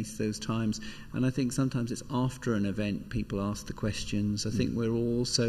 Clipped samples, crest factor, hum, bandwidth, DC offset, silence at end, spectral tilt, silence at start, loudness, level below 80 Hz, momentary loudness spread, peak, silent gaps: under 0.1%; 18 dB; none; 15 kHz; under 0.1%; 0 s; -5.5 dB/octave; 0 s; -31 LUFS; -48 dBFS; 5 LU; -12 dBFS; none